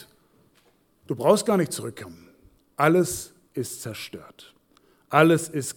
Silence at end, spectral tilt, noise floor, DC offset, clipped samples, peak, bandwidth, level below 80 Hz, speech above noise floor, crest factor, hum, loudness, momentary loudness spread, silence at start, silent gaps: 0.05 s; -5 dB/octave; -63 dBFS; under 0.1%; under 0.1%; -2 dBFS; 19 kHz; -62 dBFS; 39 dB; 24 dB; none; -23 LUFS; 20 LU; 0 s; none